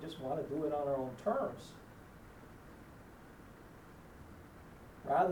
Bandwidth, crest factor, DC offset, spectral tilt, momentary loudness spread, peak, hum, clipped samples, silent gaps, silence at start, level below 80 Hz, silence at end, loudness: over 20 kHz; 22 dB; under 0.1%; -7 dB/octave; 20 LU; -18 dBFS; none; under 0.1%; none; 0 s; -62 dBFS; 0 s; -38 LUFS